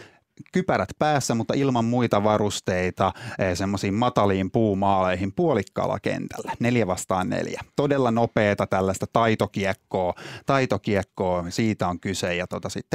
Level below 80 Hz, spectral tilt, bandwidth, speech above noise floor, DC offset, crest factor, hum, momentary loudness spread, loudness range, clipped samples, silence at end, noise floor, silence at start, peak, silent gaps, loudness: -58 dBFS; -5.5 dB/octave; 16 kHz; 26 dB; under 0.1%; 20 dB; none; 6 LU; 2 LU; under 0.1%; 0 s; -49 dBFS; 0 s; -2 dBFS; none; -24 LUFS